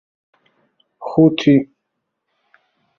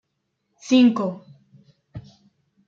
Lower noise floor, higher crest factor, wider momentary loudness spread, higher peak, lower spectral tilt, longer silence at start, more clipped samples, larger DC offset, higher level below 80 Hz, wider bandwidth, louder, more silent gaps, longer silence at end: about the same, -76 dBFS vs -75 dBFS; about the same, 18 dB vs 18 dB; second, 21 LU vs 26 LU; first, -2 dBFS vs -6 dBFS; first, -7.5 dB/octave vs -5.5 dB/octave; first, 1 s vs 0.65 s; neither; neither; about the same, -60 dBFS vs -64 dBFS; second, 6.6 kHz vs 7.4 kHz; first, -15 LUFS vs -19 LUFS; neither; first, 1.35 s vs 0.7 s